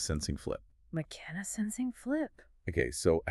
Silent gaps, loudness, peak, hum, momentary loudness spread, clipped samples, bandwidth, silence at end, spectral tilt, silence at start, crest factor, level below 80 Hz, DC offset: none; -36 LUFS; -16 dBFS; none; 11 LU; under 0.1%; 13.5 kHz; 0 s; -5 dB/octave; 0 s; 20 dB; -48 dBFS; under 0.1%